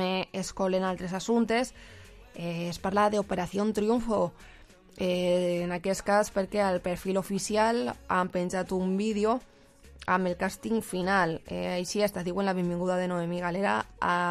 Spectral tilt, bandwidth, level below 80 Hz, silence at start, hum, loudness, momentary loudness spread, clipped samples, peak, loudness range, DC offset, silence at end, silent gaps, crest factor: -5 dB/octave; 15 kHz; -54 dBFS; 0 s; none; -29 LUFS; 7 LU; under 0.1%; -12 dBFS; 2 LU; under 0.1%; 0 s; none; 16 dB